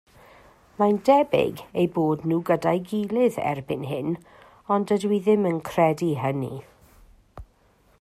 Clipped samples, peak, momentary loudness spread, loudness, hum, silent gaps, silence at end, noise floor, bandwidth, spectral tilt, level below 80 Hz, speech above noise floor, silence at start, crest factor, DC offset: under 0.1%; -6 dBFS; 10 LU; -24 LUFS; none; none; 0.55 s; -60 dBFS; 15 kHz; -7.5 dB/octave; -58 dBFS; 38 dB; 0.8 s; 18 dB; under 0.1%